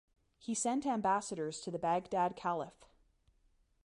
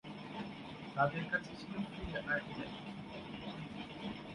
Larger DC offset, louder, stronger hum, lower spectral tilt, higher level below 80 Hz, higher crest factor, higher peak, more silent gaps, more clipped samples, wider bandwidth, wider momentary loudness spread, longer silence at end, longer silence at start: neither; first, -36 LUFS vs -41 LUFS; neither; second, -4.5 dB/octave vs -6.5 dB/octave; second, -72 dBFS vs -60 dBFS; second, 18 dB vs 24 dB; about the same, -20 dBFS vs -18 dBFS; neither; neither; about the same, 11.5 kHz vs 11.5 kHz; second, 7 LU vs 12 LU; first, 1.15 s vs 0 s; first, 0.45 s vs 0.05 s